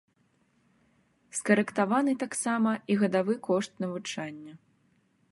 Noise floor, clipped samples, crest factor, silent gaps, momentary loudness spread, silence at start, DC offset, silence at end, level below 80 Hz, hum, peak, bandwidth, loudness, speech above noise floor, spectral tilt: -69 dBFS; under 0.1%; 22 dB; none; 12 LU; 1.35 s; under 0.1%; 0.75 s; -78 dBFS; none; -8 dBFS; 11.5 kHz; -28 LUFS; 41 dB; -5 dB/octave